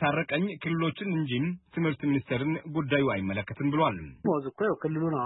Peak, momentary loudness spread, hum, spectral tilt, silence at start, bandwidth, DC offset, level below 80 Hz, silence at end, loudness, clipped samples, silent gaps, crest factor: -12 dBFS; 5 LU; none; -11 dB/octave; 0 s; 4.1 kHz; under 0.1%; -60 dBFS; 0 s; -29 LUFS; under 0.1%; none; 16 dB